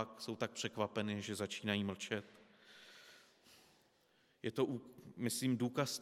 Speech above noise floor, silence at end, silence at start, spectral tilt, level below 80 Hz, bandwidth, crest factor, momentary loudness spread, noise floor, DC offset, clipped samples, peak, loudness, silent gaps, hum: 34 dB; 0 s; 0 s; -4.5 dB/octave; -86 dBFS; 16 kHz; 22 dB; 21 LU; -74 dBFS; under 0.1%; under 0.1%; -20 dBFS; -41 LUFS; none; none